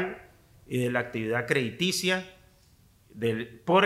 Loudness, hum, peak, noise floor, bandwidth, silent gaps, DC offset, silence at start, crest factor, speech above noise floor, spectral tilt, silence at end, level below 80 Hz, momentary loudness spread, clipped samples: -29 LUFS; none; -8 dBFS; -60 dBFS; 16 kHz; none; under 0.1%; 0 s; 20 dB; 33 dB; -4.5 dB/octave; 0 s; -64 dBFS; 9 LU; under 0.1%